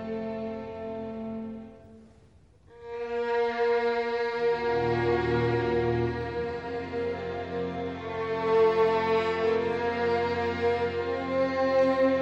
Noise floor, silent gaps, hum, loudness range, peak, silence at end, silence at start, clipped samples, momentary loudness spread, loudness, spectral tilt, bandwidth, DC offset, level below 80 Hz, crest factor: -57 dBFS; none; none; 6 LU; -14 dBFS; 0 s; 0 s; under 0.1%; 12 LU; -28 LUFS; -7 dB/octave; 7.6 kHz; under 0.1%; -52 dBFS; 14 dB